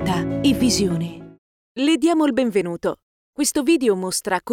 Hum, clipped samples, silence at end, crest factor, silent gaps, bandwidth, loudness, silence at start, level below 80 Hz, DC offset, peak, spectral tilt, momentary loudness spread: none; under 0.1%; 0 s; 14 dB; 1.38-1.75 s, 3.03-3.33 s; 17.5 kHz; -20 LUFS; 0 s; -46 dBFS; under 0.1%; -6 dBFS; -4.5 dB/octave; 14 LU